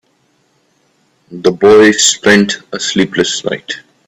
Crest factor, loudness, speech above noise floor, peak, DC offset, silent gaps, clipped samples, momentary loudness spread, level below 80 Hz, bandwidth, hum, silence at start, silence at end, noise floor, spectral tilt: 12 dB; -10 LUFS; 47 dB; 0 dBFS; under 0.1%; none; under 0.1%; 13 LU; -52 dBFS; 13 kHz; none; 1.3 s; 0.3 s; -57 dBFS; -3 dB/octave